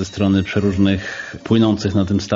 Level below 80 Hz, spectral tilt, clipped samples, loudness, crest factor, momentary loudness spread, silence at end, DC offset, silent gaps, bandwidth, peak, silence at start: -44 dBFS; -6 dB/octave; under 0.1%; -18 LUFS; 14 dB; 8 LU; 0 s; under 0.1%; none; 7.8 kHz; -4 dBFS; 0 s